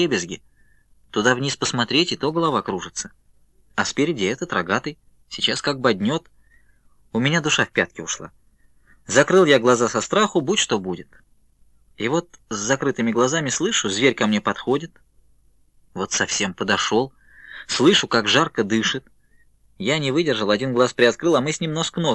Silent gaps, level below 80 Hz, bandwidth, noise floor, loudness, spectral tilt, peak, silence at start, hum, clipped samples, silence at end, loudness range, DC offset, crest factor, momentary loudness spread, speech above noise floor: none; -58 dBFS; 11.5 kHz; -56 dBFS; -20 LUFS; -3.5 dB/octave; -2 dBFS; 0 s; none; under 0.1%; 0 s; 4 LU; under 0.1%; 20 dB; 13 LU; 36 dB